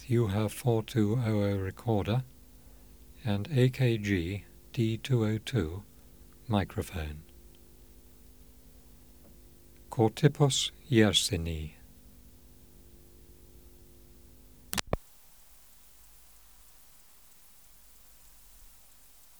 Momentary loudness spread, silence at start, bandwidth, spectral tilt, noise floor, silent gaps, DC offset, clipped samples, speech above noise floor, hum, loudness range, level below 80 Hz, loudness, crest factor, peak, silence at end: 14 LU; 0 s; over 20 kHz; -5.5 dB/octave; -58 dBFS; none; 0.1%; under 0.1%; 30 dB; none; 13 LU; -52 dBFS; -30 LUFS; 28 dB; -4 dBFS; 0.75 s